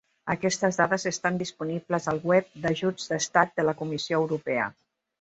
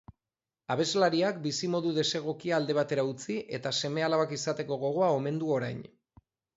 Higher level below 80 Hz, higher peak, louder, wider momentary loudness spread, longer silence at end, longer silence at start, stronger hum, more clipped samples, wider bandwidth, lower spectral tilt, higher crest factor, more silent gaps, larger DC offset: first, -64 dBFS vs -70 dBFS; first, -4 dBFS vs -12 dBFS; first, -27 LUFS vs -30 LUFS; about the same, 7 LU vs 8 LU; second, 0.5 s vs 0.7 s; second, 0.25 s vs 0.7 s; neither; neither; about the same, 8.2 kHz vs 8 kHz; about the same, -4.5 dB/octave vs -4.5 dB/octave; about the same, 22 dB vs 18 dB; neither; neither